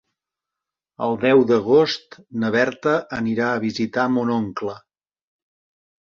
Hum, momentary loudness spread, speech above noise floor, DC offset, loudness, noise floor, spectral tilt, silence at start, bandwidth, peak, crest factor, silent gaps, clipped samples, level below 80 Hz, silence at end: none; 12 LU; 66 dB; under 0.1%; -20 LUFS; -86 dBFS; -6 dB/octave; 1 s; 7.2 kHz; -4 dBFS; 18 dB; none; under 0.1%; -60 dBFS; 1.25 s